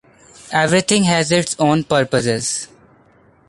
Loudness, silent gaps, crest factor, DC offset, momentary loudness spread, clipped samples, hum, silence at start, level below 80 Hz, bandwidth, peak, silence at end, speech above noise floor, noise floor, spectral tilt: -16 LUFS; none; 16 dB; under 0.1%; 8 LU; under 0.1%; none; 0.45 s; -52 dBFS; 11.5 kHz; -2 dBFS; 0.85 s; 36 dB; -52 dBFS; -4 dB/octave